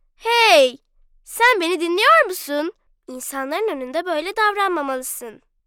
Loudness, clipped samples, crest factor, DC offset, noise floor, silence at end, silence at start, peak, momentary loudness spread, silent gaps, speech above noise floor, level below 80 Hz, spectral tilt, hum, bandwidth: -18 LUFS; under 0.1%; 16 dB; under 0.1%; -56 dBFS; 0.3 s; 0.25 s; -4 dBFS; 17 LU; none; 36 dB; -60 dBFS; 0 dB/octave; none; 19 kHz